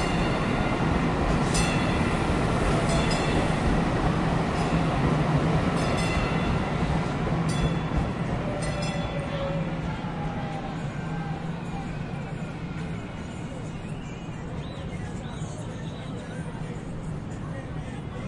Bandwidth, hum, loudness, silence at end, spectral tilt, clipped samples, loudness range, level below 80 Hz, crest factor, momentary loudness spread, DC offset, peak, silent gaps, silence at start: 11.5 kHz; none; -28 LUFS; 0 s; -6 dB/octave; under 0.1%; 10 LU; -36 dBFS; 16 dB; 11 LU; under 0.1%; -10 dBFS; none; 0 s